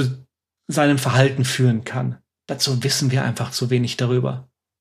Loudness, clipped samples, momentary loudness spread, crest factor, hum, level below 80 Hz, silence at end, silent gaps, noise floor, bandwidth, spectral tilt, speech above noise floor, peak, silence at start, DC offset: -20 LUFS; under 0.1%; 11 LU; 18 dB; none; -60 dBFS; 0.35 s; none; -53 dBFS; 15 kHz; -5 dB/octave; 33 dB; -4 dBFS; 0 s; under 0.1%